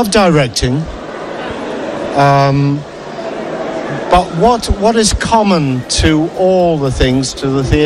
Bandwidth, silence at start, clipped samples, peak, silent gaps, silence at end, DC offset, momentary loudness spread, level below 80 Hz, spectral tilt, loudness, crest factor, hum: 13.5 kHz; 0 s; under 0.1%; 0 dBFS; none; 0 s; under 0.1%; 12 LU; -26 dBFS; -5 dB/octave; -13 LUFS; 12 dB; none